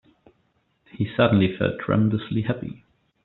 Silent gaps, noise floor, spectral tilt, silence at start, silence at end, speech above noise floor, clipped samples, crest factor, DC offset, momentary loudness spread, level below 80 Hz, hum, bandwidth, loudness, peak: none; -68 dBFS; -6.5 dB/octave; 1 s; 0.5 s; 46 dB; under 0.1%; 20 dB; under 0.1%; 11 LU; -54 dBFS; none; 4.2 kHz; -23 LUFS; -4 dBFS